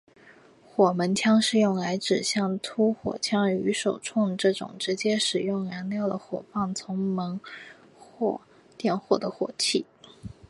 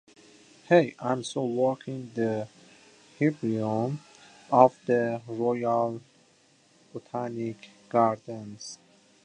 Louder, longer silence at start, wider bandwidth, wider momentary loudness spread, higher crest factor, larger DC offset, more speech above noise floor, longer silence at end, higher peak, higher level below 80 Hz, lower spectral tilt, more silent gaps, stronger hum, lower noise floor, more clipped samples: about the same, -26 LUFS vs -27 LUFS; about the same, 0.75 s vs 0.7 s; first, 11.5 kHz vs 10 kHz; second, 11 LU vs 19 LU; second, 20 dB vs 26 dB; neither; second, 28 dB vs 36 dB; second, 0.15 s vs 0.5 s; about the same, -6 dBFS vs -4 dBFS; first, -64 dBFS vs -74 dBFS; second, -4.5 dB/octave vs -6.5 dB/octave; neither; neither; second, -54 dBFS vs -62 dBFS; neither